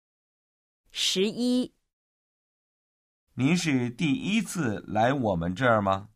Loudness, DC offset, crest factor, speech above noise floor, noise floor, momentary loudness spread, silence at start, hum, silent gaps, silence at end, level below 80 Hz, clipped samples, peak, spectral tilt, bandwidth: -26 LUFS; under 0.1%; 18 dB; over 64 dB; under -90 dBFS; 6 LU; 0.95 s; none; 1.93-3.27 s; 0.1 s; -58 dBFS; under 0.1%; -10 dBFS; -5 dB/octave; 15.5 kHz